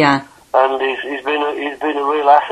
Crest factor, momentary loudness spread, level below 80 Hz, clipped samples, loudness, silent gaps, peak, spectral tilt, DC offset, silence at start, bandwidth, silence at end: 16 dB; 8 LU; -58 dBFS; under 0.1%; -17 LUFS; none; 0 dBFS; -5.5 dB/octave; under 0.1%; 0 s; 12 kHz; 0 s